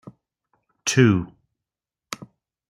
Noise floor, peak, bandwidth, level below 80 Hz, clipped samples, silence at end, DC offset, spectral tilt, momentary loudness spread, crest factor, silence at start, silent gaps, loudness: -88 dBFS; -4 dBFS; 14.5 kHz; -60 dBFS; under 0.1%; 0.55 s; under 0.1%; -5 dB/octave; 19 LU; 22 dB; 0.05 s; none; -20 LUFS